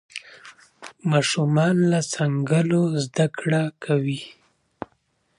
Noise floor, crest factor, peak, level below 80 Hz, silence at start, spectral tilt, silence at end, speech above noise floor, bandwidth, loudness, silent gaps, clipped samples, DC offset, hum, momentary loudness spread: -68 dBFS; 16 dB; -6 dBFS; -66 dBFS; 0.15 s; -6 dB/octave; 1.1 s; 46 dB; 11 kHz; -22 LUFS; none; under 0.1%; under 0.1%; none; 20 LU